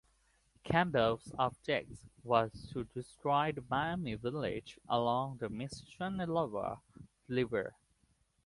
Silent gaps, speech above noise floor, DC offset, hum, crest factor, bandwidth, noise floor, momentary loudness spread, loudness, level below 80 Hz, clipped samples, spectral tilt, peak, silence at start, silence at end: none; 39 dB; under 0.1%; none; 22 dB; 11.5 kHz; -74 dBFS; 12 LU; -36 LUFS; -62 dBFS; under 0.1%; -6.5 dB/octave; -14 dBFS; 0.65 s; 0.75 s